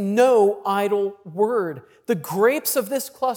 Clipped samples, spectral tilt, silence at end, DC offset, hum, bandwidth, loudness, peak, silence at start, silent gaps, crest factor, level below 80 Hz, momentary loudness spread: under 0.1%; -4.5 dB/octave; 0 s; under 0.1%; none; 18.5 kHz; -21 LUFS; -6 dBFS; 0 s; none; 14 dB; -76 dBFS; 11 LU